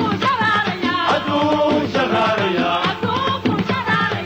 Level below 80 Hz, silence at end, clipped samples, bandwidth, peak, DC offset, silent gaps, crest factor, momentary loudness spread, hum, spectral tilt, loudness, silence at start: -52 dBFS; 0 s; under 0.1%; over 20 kHz; -8 dBFS; under 0.1%; none; 10 dB; 3 LU; none; -5.5 dB/octave; -18 LUFS; 0 s